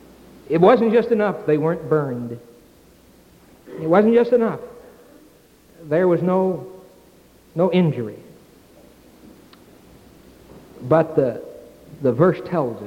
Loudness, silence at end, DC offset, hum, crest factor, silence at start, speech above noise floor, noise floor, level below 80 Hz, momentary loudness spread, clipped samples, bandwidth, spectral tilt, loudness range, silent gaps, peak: -19 LUFS; 0 s; under 0.1%; none; 20 dB; 0.5 s; 33 dB; -51 dBFS; -58 dBFS; 18 LU; under 0.1%; 16 kHz; -8.5 dB/octave; 6 LU; none; -2 dBFS